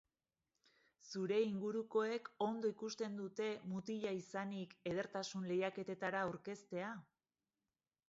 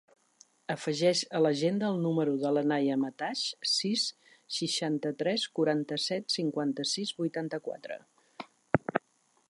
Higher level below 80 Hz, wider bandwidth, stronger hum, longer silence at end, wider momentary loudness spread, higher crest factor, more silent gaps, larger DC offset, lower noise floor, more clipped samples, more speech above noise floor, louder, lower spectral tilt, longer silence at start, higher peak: second, -84 dBFS vs -72 dBFS; second, 7.6 kHz vs 11.5 kHz; neither; first, 1.05 s vs 0.5 s; second, 7 LU vs 11 LU; second, 18 dB vs 24 dB; neither; neither; first, under -90 dBFS vs -71 dBFS; neither; first, over 48 dB vs 40 dB; second, -43 LUFS vs -30 LUFS; about the same, -4.5 dB/octave vs -4.5 dB/octave; first, 1.05 s vs 0.7 s; second, -26 dBFS vs -6 dBFS